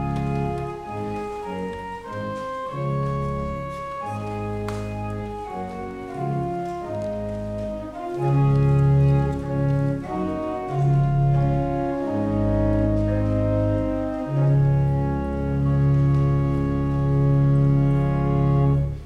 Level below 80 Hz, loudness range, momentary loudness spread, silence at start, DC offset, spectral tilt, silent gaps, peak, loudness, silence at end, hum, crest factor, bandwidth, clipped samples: -34 dBFS; 9 LU; 12 LU; 0 s; under 0.1%; -9.5 dB/octave; none; -8 dBFS; -23 LUFS; 0 s; none; 12 dB; 5.2 kHz; under 0.1%